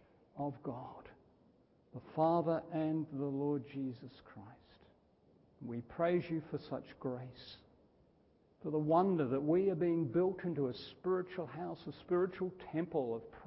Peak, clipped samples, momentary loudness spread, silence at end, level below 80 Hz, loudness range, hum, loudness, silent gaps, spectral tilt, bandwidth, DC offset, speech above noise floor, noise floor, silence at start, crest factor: -18 dBFS; under 0.1%; 20 LU; 0 s; -72 dBFS; 7 LU; none; -37 LUFS; none; -7.5 dB/octave; 5.6 kHz; under 0.1%; 33 dB; -70 dBFS; 0.35 s; 20 dB